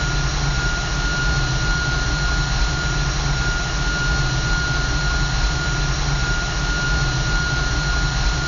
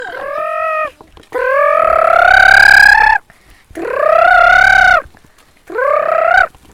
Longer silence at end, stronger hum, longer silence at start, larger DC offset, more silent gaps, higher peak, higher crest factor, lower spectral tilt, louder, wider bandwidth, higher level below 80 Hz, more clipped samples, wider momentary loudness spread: second, 0 s vs 0.25 s; neither; about the same, 0 s vs 0 s; neither; neither; second, -6 dBFS vs 0 dBFS; about the same, 12 dB vs 10 dB; first, -3.5 dB/octave vs -2 dB/octave; second, -21 LUFS vs -8 LUFS; second, 7.6 kHz vs 18.5 kHz; first, -22 dBFS vs -36 dBFS; second, under 0.1% vs 0.5%; second, 1 LU vs 17 LU